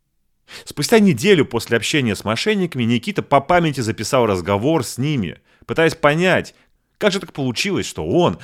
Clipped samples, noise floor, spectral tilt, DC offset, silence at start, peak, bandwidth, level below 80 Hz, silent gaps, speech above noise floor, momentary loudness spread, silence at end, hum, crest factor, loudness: under 0.1%; -59 dBFS; -5 dB/octave; under 0.1%; 0.5 s; 0 dBFS; 16 kHz; -50 dBFS; none; 42 dB; 9 LU; 0 s; none; 18 dB; -18 LUFS